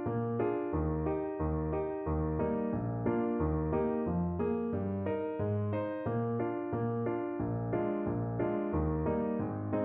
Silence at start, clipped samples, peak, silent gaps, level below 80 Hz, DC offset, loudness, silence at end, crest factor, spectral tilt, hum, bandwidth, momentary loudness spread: 0 s; under 0.1%; -20 dBFS; none; -46 dBFS; under 0.1%; -34 LUFS; 0 s; 14 dB; -10 dB/octave; none; 3.8 kHz; 3 LU